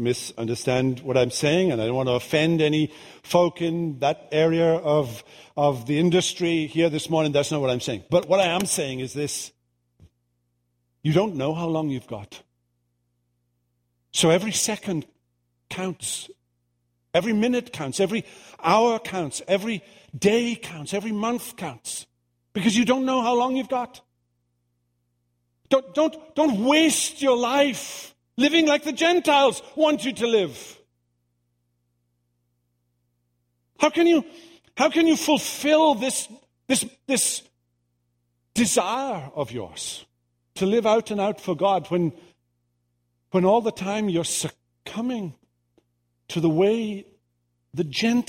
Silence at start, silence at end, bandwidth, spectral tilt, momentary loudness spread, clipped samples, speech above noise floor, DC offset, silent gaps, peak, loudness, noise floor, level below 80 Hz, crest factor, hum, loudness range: 0 s; 0.05 s; 16 kHz; -4.5 dB/octave; 13 LU; under 0.1%; 50 dB; under 0.1%; none; -4 dBFS; -23 LUFS; -73 dBFS; -62 dBFS; 20 dB; 60 Hz at -55 dBFS; 6 LU